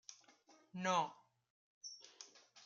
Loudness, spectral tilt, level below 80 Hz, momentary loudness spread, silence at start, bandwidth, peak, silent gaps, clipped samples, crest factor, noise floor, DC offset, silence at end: -42 LUFS; -3.5 dB/octave; under -90 dBFS; 20 LU; 0.1 s; 7.6 kHz; -24 dBFS; 1.50-1.81 s; under 0.1%; 22 dB; -69 dBFS; under 0.1%; 0 s